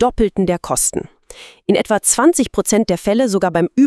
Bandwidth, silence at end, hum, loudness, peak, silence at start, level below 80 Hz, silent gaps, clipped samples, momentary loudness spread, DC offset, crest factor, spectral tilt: 12 kHz; 0 s; none; -15 LUFS; 0 dBFS; 0 s; -38 dBFS; none; under 0.1%; 6 LU; under 0.1%; 16 dB; -4 dB/octave